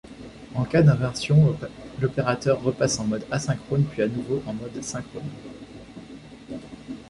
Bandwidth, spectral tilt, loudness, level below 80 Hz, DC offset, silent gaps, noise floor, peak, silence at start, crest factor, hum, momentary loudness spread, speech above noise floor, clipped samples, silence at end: 11.5 kHz; -6 dB/octave; -24 LUFS; -50 dBFS; under 0.1%; none; -43 dBFS; -6 dBFS; 0.05 s; 18 dB; none; 23 LU; 20 dB; under 0.1%; 0 s